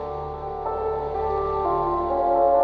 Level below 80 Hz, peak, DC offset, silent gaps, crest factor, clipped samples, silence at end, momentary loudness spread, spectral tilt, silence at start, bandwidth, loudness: -40 dBFS; -8 dBFS; under 0.1%; none; 14 dB; under 0.1%; 0 s; 11 LU; -9.5 dB/octave; 0 s; 5.8 kHz; -24 LUFS